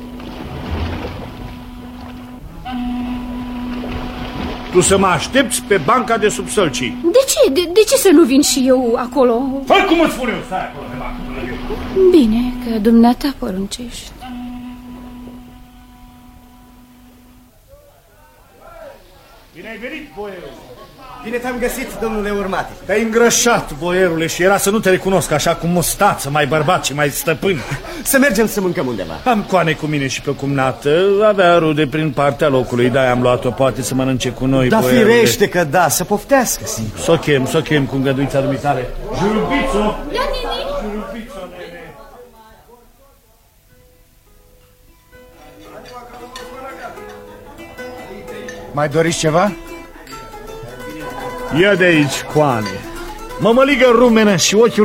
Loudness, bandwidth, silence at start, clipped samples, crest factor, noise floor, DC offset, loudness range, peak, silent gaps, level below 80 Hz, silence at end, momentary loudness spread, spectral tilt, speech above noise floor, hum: -15 LUFS; 16.5 kHz; 0 s; under 0.1%; 16 dB; -51 dBFS; under 0.1%; 19 LU; 0 dBFS; none; -36 dBFS; 0 s; 21 LU; -4.5 dB/octave; 37 dB; none